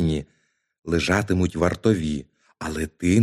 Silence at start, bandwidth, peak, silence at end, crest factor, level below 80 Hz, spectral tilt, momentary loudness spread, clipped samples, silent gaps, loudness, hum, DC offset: 0 s; 15 kHz; -6 dBFS; 0 s; 18 dB; -40 dBFS; -6 dB/octave; 11 LU; under 0.1%; 0.79-0.83 s; -24 LUFS; none; under 0.1%